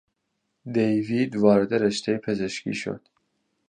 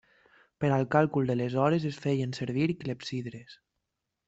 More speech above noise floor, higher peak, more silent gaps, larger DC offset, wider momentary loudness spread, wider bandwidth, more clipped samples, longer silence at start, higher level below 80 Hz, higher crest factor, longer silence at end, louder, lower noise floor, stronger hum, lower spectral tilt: about the same, 54 dB vs 56 dB; about the same, -6 dBFS vs -8 dBFS; neither; neither; about the same, 13 LU vs 11 LU; first, 9.8 kHz vs 8 kHz; neither; about the same, 0.65 s vs 0.6 s; about the same, -62 dBFS vs -66 dBFS; about the same, 20 dB vs 22 dB; about the same, 0.7 s vs 0.75 s; first, -24 LUFS vs -29 LUFS; second, -77 dBFS vs -84 dBFS; neither; second, -6 dB/octave vs -7.5 dB/octave